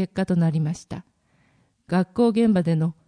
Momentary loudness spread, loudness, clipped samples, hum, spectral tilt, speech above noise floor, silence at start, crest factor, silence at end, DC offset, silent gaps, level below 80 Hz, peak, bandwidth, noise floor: 14 LU; -22 LUFS; under 0.1%; none; -8 dB/octave; 41 dB; 0 s; 14 dB; 0.15 s; under 0.1%; none; -56 dBFS; -8 dBFS; 10.5 kHz; -63 dBFS